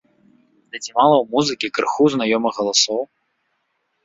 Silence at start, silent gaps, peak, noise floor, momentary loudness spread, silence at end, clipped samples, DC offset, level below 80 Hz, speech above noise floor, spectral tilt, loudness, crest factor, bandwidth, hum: 0.75 s; none; -2 dBFS; -70 dBFS; 13 LU; 1 s; under 0.1%; under 0.1%; -64 dBFS; 52 dB; -3 dB/octave; -18 LUFS; 18 dB; 7.8 kHz; none